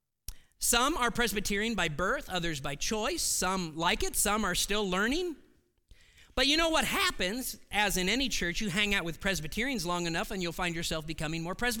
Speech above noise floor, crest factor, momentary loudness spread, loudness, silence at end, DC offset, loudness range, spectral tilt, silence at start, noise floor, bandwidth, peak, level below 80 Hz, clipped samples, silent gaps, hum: 31 dB; 18 dB; 9 LU; -30 LUFS; 0 s; under 0.1%; 2 LU; -2.5 dB/octave; 0.3 s; -61 dBFS; 18 kHz; -12 dBFS; -44 dBFS; under 0.1%; none; none